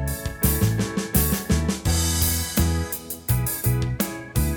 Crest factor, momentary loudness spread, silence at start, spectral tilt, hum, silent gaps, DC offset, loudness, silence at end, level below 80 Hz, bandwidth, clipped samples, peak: 16 dB; 6 LU; 0 s; -4.5 dB/octave; none; none; under 0.1%; -23 LUFS; 0 s; -30 dBFS; 19.5 kHz; under 0.1%; -6 dBFS